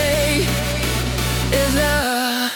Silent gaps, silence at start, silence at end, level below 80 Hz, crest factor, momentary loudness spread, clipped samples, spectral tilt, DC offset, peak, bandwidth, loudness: none; 0 s; 0 s; -28 dBFS; 14 dB; 4 LU; under 0.1%; -4 dB/octave; under 0.1%; -4 dBFS; 19 kHz; -18 LUFS